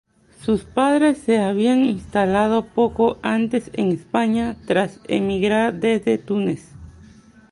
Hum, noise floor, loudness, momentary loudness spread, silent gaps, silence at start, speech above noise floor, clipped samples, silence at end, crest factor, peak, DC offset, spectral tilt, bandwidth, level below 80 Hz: none; -47 dBFS; -20 LUFS; 6 LU; none; 0.4 s; 28 dB; under 0.1%; 0.6 s; 16 dB; -4 dBFS; under 0.1%; -6.5 dB/octave; 11 kHz; -48 dBFS